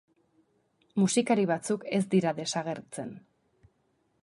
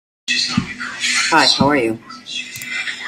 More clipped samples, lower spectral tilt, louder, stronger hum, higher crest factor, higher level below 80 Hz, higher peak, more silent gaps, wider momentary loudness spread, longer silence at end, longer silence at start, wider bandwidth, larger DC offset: neither; first, -5 dB/octave vs -2.5 dB/octave; second, -29 LUFS vs -17 LUFS; neither; about the same, 18 dB vs 18 dB; second, -76 dBFS vs -50 dBFS; second, -12 dBFS vs 0 dBFS; neither; about the same, 13 LU vs 14 LU; first, 1.05 s vs 0 s; first, 0.95 s vs 0.25 s; second, 11.5 kHz vs 16 kHz; neither